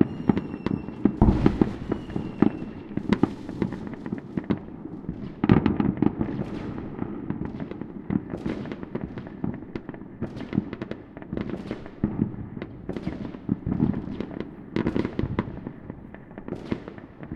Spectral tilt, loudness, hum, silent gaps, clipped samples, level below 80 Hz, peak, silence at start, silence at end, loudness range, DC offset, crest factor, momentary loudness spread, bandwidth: -9.5 dB/octave; -29 LUFS; none; none; under 0.1%; -40 dBFS; -2 dBFS; 0 s; 0 s; 8 LU; under 0.1%; 26 dB; 15 LU; 7.2 kHz